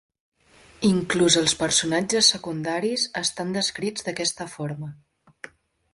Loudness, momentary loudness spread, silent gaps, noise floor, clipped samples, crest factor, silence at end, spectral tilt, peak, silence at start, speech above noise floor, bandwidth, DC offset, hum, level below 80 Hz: -22 LUFS; 19 LU; none; -54 dBFS; under 0.1%; 20 dB; 1 s; -3 dB/octave; -6 dBFS; 0.8 s; 30 dB; 11.5 kHz; under 0.1%; none; -58 dBFS